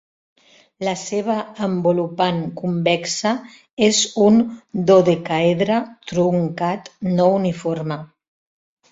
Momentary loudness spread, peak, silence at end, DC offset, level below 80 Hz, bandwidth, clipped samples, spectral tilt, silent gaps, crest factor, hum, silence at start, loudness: 11 LU; -2 dBFS; 0.85 s; under 0.1%; -58 dBFS; 8 kHz; under 0.1%; -5 dB/octave; 3.73-3.77 s; 18 dB; none; 0.8 s; -19 LUFS